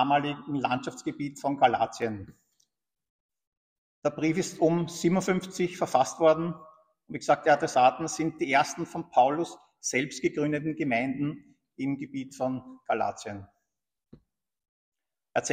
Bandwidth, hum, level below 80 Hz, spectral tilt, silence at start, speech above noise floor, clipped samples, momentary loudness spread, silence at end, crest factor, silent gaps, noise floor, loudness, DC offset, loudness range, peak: 15.5 kHz; none; -68 dBFS; -5 dB/octave; 0 s; 60 dB; under 0.1%; 12 LU; 0 s; 20 dB; 3.10-3.29 s, 3.47-4.02 s, 14.69-14.92 s; -87 dBFS; -28 LUFS; under 0.1%; 9 LU; -8 dBFS